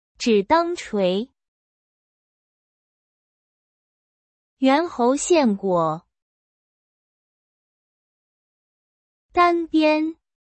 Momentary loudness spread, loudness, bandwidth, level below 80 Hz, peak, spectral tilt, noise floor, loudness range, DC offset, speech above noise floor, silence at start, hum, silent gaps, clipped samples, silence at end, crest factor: 8 LU; -20 LUFS; 8.8 kHz; -60 dBFS; -6 dBFS; -4.5 dB/octave; under -90 dBFS; 8 LU; under 0.1%; over 71 dB; 0.2 s; none; 1.48-4.57 s, 6.22-9.29 s; under 0.1%; 0.3 s; 18 dB